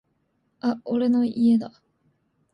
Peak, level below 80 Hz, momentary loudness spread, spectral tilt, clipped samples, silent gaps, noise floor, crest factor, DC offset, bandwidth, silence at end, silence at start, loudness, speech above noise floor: -12 dBFS; -70 dBFS; 8 LU; -8 dB/octave; under 0.1%; none; -71 dBFS; 14 dB; under 0.1%; 5.4 kHz; 0.85 s; 0.65 s; -23 LUFS; 49 dB